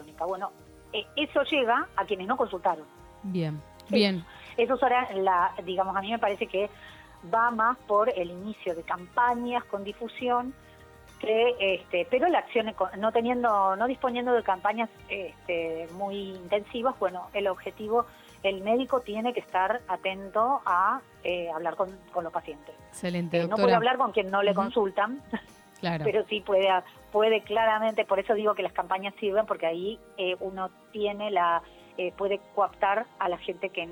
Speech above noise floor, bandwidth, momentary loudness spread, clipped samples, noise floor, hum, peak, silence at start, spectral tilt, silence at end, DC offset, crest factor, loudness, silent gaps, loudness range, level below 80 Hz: 24 dB; 19 kHz; 11 LU; under 0.1%; -52 dBFS; none; -10 dBFS; 0 s; -6 dB/octave; 0 s; under 0.1%; 18 dB; -28 LUFS; none; 4 LU; -62 dBFS